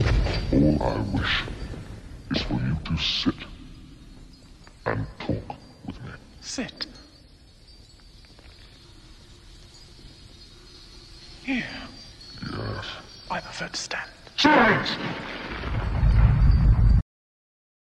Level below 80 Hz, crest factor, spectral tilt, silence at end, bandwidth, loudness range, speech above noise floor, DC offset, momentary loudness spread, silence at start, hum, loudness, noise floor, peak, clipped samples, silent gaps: -30 dBFS; 22 dB; -5.5 dB/octave; 1 s; 9.6 kHz; 17 LU; 26 dB; under 0.1%; 26 LU; 0 s; none; -25 LUFS; -51 dBFS; -4 dBFS; under 0.1%; none